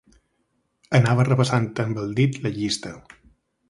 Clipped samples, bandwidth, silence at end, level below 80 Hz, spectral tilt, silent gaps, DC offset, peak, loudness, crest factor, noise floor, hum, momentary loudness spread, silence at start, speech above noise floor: under 0.1%; 11.5 kHz; 0.7 s; -56 dBFS; -6 dB/octave; none; under 0.1%; -2 dBFS; -22 LUFS; 20 dB; -71 dBFS; none; 8 LU; 0.9 s; 50 dB